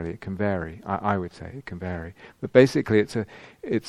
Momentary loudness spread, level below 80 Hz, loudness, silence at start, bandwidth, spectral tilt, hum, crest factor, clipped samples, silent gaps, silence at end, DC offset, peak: 19 LU; -52 dBFS; -24 LUFS; 0 s; 13 kHz; -7 dB/octave; none; 24 dB; under 0.1%; none; 0 s; under 0.1%; 0 dBFS